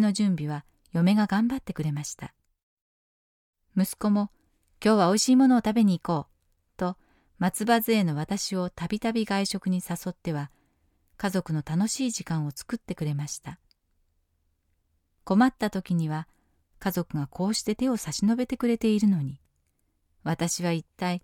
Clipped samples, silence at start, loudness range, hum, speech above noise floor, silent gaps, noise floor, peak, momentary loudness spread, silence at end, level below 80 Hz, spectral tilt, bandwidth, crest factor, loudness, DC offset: under 0.1%; 0 s; 7 LU; none; 47 dB; 2.63-3.53 s; -72 dBFS; -10 dBFS; 12 LU; 0.05 s; -58 dBFS; -5.5 dB/octave; 17 kHz; 16 dB; -27 LUFS; under 0.1%